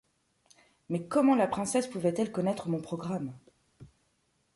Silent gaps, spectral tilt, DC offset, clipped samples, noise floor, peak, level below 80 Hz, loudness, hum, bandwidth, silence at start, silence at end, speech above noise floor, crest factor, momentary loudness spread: none; -6 dB/octave; under 0.1%; under 0.1%; -74 dBFS; -14 dBFS; -68 dBFS; -30 LUFS; none; 11.5 kHz; 0.9 s; 0.7 s; 44 dB; 16 dB; 11 LU